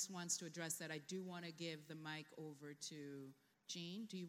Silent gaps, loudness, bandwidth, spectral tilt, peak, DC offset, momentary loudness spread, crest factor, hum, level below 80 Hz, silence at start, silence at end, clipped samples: none; -49 LUFS; 16 kHz; -3 dB/octave; -28 dBFS; under 0.1%; 11 LU; 22 dB; none; under -90 dBFS; 0 s; 0 s; under 0.1%